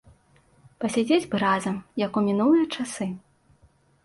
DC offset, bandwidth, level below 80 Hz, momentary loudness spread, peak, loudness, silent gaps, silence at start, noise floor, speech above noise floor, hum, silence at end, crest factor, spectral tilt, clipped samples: under 0.1%; 11.5 kHz; -64 dBFS; 11 LU; -10 dBFS; -24 LUFS; none; 0.8 s; -61 dBFS; 37 dB; none; 0.85 s; 16 dB; -5.5 dB/octave; under 0.1%